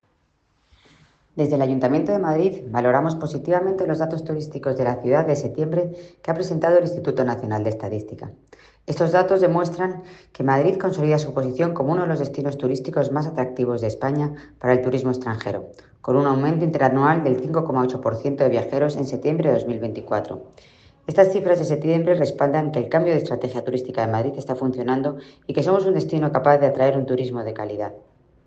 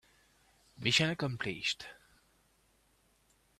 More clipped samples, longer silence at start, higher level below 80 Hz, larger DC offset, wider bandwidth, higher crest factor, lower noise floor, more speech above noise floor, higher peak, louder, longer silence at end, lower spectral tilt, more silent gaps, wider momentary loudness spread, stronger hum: neither; first, 1.35 s vs 0.8 s; first, -58 dBFS vs -68 dBFS; neither; second, 8 kHz vs 14 kHz; second, 20 dB vs 26 dB; second, -66 dBFS vs -71 dBFS; first, 45 dB vs 37 dB; first, -2 dBFS vs -12 dBFS; first, -21 LUFS vs -32 LUFS; second, 0.5 s vs 1.65 s; first, -8 dB/octave vs -3.5 dB/octave; neither; about the same, 10 LU vs 11 LU; neither